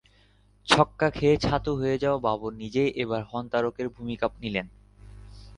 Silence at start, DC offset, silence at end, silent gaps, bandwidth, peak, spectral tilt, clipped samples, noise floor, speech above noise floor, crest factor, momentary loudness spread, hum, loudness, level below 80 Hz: 0.65 s; under 0.1%; 0 s; none; 11 kHz; -4 dBFS; -5.5 dB/octave; under 0.1%; -60 dBFS; 34 dB; 24 dB; 11 LU; 50 Hz at -50 dBFS; -26 LUFS; -48 dBFS